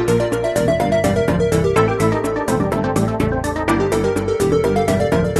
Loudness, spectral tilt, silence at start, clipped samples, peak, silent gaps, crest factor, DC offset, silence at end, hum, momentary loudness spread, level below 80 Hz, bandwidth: -17 LUFS; -6.5 dB/octave; 0 s; under 0.1%; -2 dBFS; none; 14 dB; under 0.1%; 0 s; none; 3 LU; -34 dBFS; 13 kHz